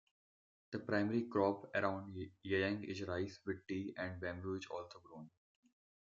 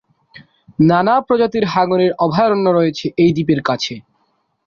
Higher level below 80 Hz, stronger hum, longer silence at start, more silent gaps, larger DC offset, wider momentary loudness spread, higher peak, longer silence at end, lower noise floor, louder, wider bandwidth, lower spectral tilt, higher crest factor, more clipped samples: second, -80 dBFS vs -54 dBFS; neither; first, 0.7 s vs 0.35 s; neither; neither; first, 14 LU vs 7 LU; second, -20 dBFS vs -2 dBFS; first, 0.8 s vs 0.65 s; first, under -90 dBFS vs -64 dBFS; second, -41 LUFS vs -15 LUFS; about the same, 7.6 kHz vs 7.2 kHz; second, -5 dB/octave vs -7 dB/octave; first, 22 dB vs 14 dB; neither